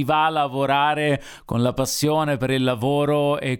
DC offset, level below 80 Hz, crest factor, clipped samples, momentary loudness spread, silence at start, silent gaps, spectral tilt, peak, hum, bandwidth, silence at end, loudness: under 0.1%; -50 dBFS; 14 dB; under 0.1%; 4 LU; 0 s; none; -5 dB/octave; -6 dBFS; none; 19.5 kHz; 0 s; -21 LUFS